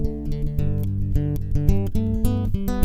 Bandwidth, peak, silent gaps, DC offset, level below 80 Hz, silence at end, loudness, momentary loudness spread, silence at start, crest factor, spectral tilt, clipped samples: 15.5 kHz; -2 dBFS; none; under 0.1%; -26 dBFS; 0 s; -24 LUFS; 5 LU; 0 s; 18 dB; -8.5 dB/octave; under 0.1%